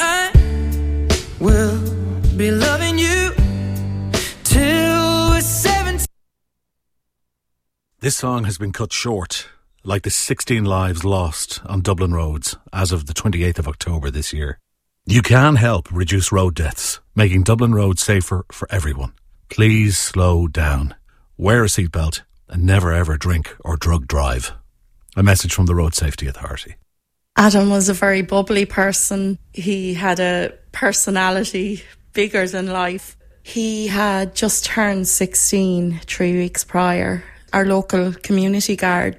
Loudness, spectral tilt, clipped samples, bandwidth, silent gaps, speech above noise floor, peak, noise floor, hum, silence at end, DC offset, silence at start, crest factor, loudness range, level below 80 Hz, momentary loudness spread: -18 LUFS; -4.5 dB/octave; under 0.1%; 16 kHz; none; 57 dB; 0 dBFS; -74 dBFS; none; 0.05 s; under 0.1%; 0 s; 18 dB; 5 LU; -26 dBFS; 10 LU